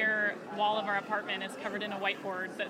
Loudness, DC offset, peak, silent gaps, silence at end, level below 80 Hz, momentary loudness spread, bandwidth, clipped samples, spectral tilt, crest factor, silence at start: -33 LUFS; under 0.1%; -16 dBFS; none; 0 s; -82 dBFS; 7 LU; 16 kHz; under 0.1%; -4 dB/octave; 16 dB; 0 s